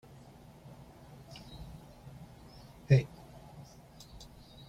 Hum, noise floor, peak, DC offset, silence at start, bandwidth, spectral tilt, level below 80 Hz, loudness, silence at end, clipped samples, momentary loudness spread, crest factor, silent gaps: none; -55 dBFS; -12 dBFS; under 0.1%; 0.1 s; 11.5 kHz; -7.5 dB/octave; -58 dBFS; -30 LUFS; 0.05 s; under 0.1%; 26 LU; 26 dB; none